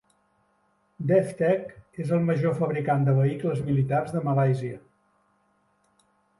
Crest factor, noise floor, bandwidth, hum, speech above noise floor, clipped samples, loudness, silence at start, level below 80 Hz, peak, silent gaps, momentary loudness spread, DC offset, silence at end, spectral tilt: 16 dB; -68 dBFS; 11.5 kHz; none; 44 dB; under 0.1%; -25 LUFS; 1 s; -62 dBFS; -10 dBFS; none; 11 LU; under 0.1%; 1.6 s; -9 dB/octave